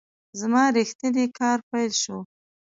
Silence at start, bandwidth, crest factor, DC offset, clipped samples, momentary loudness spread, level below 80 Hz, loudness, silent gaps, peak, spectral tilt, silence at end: 0.35 s; 8 kHz; 16 dB; under 0.1%; under 0.1%; 11 LU; -72 dBFS; -23 LUFS; 0.95-0.99 s, 1.63-1.71 s; -10 dBFS; -3 dB/octave; 0.45 s